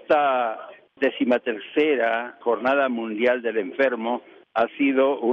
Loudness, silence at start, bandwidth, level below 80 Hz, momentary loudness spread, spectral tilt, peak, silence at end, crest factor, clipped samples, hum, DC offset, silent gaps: -23 LUFS; 0.1 s; 6.2 kHz; -72 dBFS; 7 LU; -6.5 dB/octave; -8 dBFS; 0 s; 14 dB; under 0.1%; none; under 0.1%; none